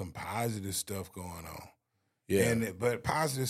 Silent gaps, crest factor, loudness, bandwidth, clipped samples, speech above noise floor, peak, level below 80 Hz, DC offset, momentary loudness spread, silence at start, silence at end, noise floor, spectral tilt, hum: none; 22 dB; -33 LUFS; 16 kHz; under 0.1%; 47 dB; -12 dBFS; -58 dBFS; under 0.1%; 15 LU; 0 s; 0 s; -80 dBFS; -4.5 dB/octave; none